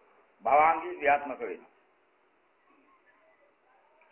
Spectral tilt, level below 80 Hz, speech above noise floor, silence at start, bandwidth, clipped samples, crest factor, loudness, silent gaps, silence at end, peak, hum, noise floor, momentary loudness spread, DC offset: -7.5 dB/octave; -72 dBFS; 42 dB; 0.45 s; 3.3 kHz; under 0.1%; 20 dB; -27 LUFS; none; 2.55 s; -12 dBFS; none; -69 dBFS; 16 LU; under 0.1%